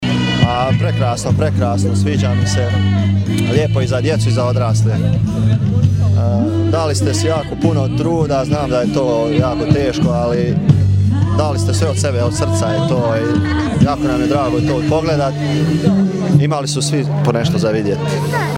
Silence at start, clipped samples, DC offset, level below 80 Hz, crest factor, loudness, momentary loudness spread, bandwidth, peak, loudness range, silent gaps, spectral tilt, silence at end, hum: 0 s; under 0.1%; under 0.1%; -34 dBFS; 14 dB; -15 LUFS; 2 LU; 12 kHz; 0 dBFS; 1 LU; none; -6.5 dB/octave; 0 s; none